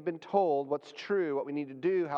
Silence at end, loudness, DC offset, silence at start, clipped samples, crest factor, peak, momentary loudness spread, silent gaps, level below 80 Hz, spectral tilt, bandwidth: 0 s; -32 LUFS; under 0.1%; 0 s; under 0.1%; 18 dB; -14 dBFS; 8 LU; none; -86 dBFS; -7 dB/octave; 7.4 kHz